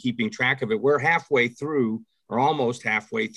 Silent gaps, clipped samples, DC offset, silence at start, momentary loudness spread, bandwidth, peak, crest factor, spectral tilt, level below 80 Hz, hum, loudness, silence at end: none; under 0.1%; under 0.1%; 0.05 s; 6 LU; 11 kHz; -8 dBFS; 16 dB; -5.5 dB/octave; -68 dBFS; none; -23 LUFS; 0.05 s